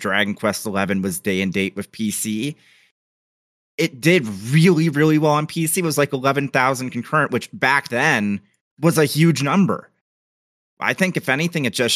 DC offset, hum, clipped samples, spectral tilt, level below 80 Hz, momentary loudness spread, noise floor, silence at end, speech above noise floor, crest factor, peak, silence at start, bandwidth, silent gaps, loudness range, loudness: under 0.1%; none; under 0.1%; -5 dB/octave; -64 dBFS; 8 LU; under -90 dBFS; 0 s; over 71 dB; 18 dB; -2 dBFS; 0 s; 15 kHz; 2.91-3.78 s, 8.61-8.77 s, 10.01-10.77 s; 5 LU; -19 LUFS